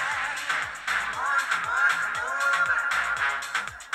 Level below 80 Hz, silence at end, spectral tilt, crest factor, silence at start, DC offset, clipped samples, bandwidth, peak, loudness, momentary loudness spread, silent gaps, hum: -60 dBFS; 0 s; 0 dB/octave; 16 dB; 0 s; under 0.1%; under 0.1%; 15.5 kHz; -12 dBFS; -25 LUFS; 5 LU; none; none